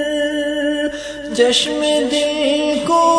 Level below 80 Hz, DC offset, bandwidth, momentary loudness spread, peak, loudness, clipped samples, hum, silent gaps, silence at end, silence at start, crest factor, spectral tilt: -48 dBFS; under 0.1%; 11 kHz; 8 LU; -2 dBFS; -17 LUFS; under 0.1%; none; none; 0 s; 0 s; 16 dB; -2.5 dB/octave